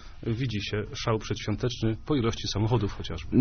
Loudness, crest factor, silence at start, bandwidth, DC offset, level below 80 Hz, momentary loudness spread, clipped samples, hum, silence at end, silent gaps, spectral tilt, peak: -29 LUFS; 20 dB; 0 s; 6.6 kHz; under 0.1%; -42 dBFS; 5 LU; under 0.1%; none; 0 s; none; -5.5 dB/octave; -8 dBFS